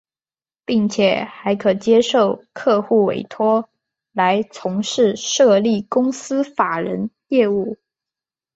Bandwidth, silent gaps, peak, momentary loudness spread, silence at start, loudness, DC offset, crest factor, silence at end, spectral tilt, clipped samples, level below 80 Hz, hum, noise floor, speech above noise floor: 8 kHz; none; -2 dBFS; 9 LU; 0.7 s; -18 LUFS; under 0.1%; 16 dB; 0.8 s; -4.5 dB/octave; under 0.1%; -62 dBFS; none; under -90 dBFS; over 73 dB